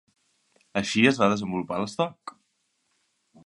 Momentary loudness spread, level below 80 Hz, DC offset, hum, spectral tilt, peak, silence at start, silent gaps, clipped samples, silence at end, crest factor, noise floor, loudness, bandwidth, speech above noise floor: 14 LU; -64 dBFS; under 0.1%; none; -5 dB/octave; -4 dBFS; 0.75 s; none; under 0.1%; 1.15 s; 22 dB; -74 dBFS; -25 LUFS; 11.5 kHz; 49 dB